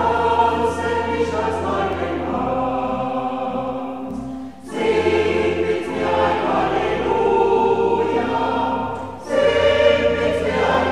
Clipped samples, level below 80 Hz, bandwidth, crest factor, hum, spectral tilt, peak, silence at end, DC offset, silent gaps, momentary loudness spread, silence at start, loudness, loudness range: under 0.1%; -44 dBFS; 11.5 kHz; 16 dB; none; -6 dB/octave; -4 dBFS; 0 s; 0.6%; none; 10 LU; 0 s; -19 LUFS; 5 LU